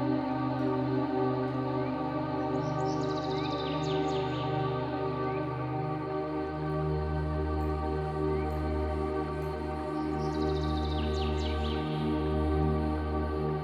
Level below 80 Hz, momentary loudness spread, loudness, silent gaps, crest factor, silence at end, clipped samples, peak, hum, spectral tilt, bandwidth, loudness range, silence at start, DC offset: -40 dBFS; 4 LU; -32 LUFS; none; 14 dB; 0 s; under 0.1%; -16 dBFS; none; -8 dB/octave; 9.2 kHz; 2 LU; 0 s; under 0.1%